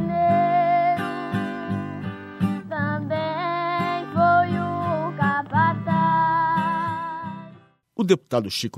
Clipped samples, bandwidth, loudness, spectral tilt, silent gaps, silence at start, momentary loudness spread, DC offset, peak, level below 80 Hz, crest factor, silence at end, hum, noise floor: under 0.1%; 14 kHz; -23 LUFS; -6.5 dB/octave; none; 0 s; 10 LU; under 0.1%; -4 dBFS; -62 dBFS; 18 dB; 0 s; none; -50 dBFS